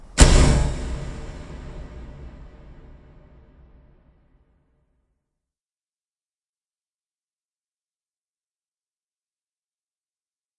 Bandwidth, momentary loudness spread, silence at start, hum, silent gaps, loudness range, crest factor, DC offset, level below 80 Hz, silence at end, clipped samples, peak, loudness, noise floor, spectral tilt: 11.5 kHz; 27 LU; 0.15 s; none; none; 27 LU; 26 dB; under 0.1%; -28 dBFS; 8.3 s; under 0.1%; 0 dBFS; -19 LUFS; under -90 dBFS; -4.5 dB/octave